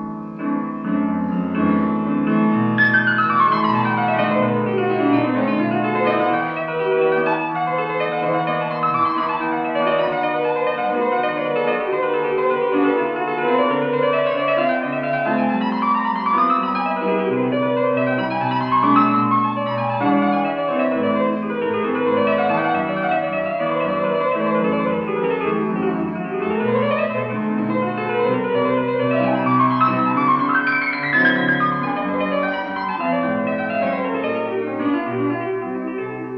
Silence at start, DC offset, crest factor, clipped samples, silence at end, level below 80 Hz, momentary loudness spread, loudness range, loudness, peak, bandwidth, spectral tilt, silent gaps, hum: 0 s; under 0.1%; 16 dB; under 0.1%; 0 s; -60 dBFS; 6 LU; 3 LU; -19 LUFS; -4 dBFS; 5.6 kHz; -9 dB/octave; none; none